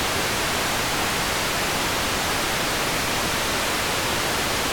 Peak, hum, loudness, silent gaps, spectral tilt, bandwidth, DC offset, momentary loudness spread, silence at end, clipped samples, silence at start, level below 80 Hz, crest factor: -14 dBFS; none; -22 LUFS; none; -2 dB/octave; over 20 kHz; under 0.1%; 0 LU; 0 s; under 0.1%; 0 s; -40 dBFS; 10 dB